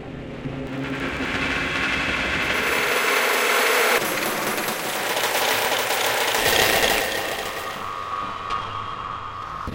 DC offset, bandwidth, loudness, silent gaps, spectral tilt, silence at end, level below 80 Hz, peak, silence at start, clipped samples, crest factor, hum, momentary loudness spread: under 0.1%; 17 kHz; -21 LUFS; none; -2 dB/octave; 0 s; -46 dBFS; -2 dBFS; 0 s; under 0.1%; 22 dB; none; 13 LU